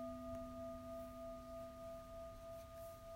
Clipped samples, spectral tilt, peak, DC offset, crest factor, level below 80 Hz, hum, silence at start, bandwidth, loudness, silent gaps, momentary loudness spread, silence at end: under 0.1%; -6.5 dB/octave; -38 dBFS; under 0.1%; 14 dB; -62 dBFS; none; 0 s; 16 kHz; -52 LUFS; none; 5 LU; 0 s